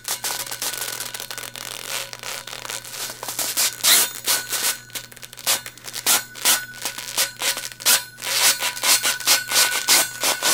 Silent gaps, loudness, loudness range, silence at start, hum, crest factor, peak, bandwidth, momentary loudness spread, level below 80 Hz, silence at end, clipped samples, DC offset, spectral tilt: none; -19 LUFS; 8 LU; 0 s; none; 22 dB; 0 dBFS; 19 kHz; 14 LU; -66 dBFS; 0 s; under 0.1%; under 0.1%; 1.5 dB/octave